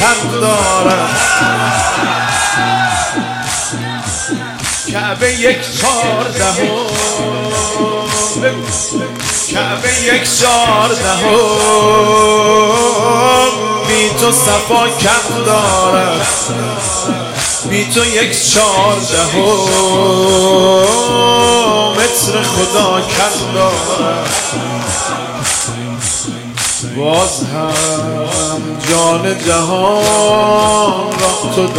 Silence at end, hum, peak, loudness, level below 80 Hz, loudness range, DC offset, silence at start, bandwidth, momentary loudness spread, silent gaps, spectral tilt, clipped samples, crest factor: 0 s; none; 0 dBFS; -11 LUFS; -38 dBFS; 5 LU; under 0.1%; 0 s; 16.5 kHz; 7 LU; none; -2.5 dB/octave; under 0.1%; 12 dB